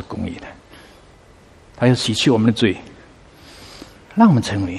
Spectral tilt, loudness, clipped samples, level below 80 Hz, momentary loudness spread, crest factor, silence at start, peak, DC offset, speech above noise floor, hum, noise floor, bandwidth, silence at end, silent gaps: -6 dB/octave; -17 LUFS; under 0.1%; -50 dBFS; 25 LU; 20 dB; 0 s; 0 dBFS; under 0.1%; 31 dB; none; -47 dBFS; 12 kHz; 0 s; none